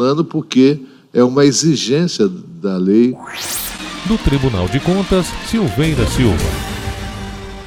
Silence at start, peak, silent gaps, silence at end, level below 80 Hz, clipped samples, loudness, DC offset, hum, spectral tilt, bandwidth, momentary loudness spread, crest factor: 0 s; 0 dBFS; none; 0 s; -28 dBFS; under 0.1%; -16 LUFS; under 0.1%; none; -5.5 dB/octave; 19.5 kHz; 12 LU; 16 dB